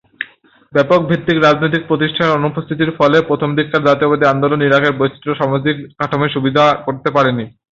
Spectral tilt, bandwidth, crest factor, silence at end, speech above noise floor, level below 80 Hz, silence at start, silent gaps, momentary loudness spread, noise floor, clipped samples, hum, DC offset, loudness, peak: -7 dB/octave; 7.6 kHz; 14 dB; 0.25 s; 32 dB; -52 dBFS; 0.2 s; none; 7 LU; -46 dBFS; under 0.1%; none; under 0.1%; -14 LUFS; 0 dBFS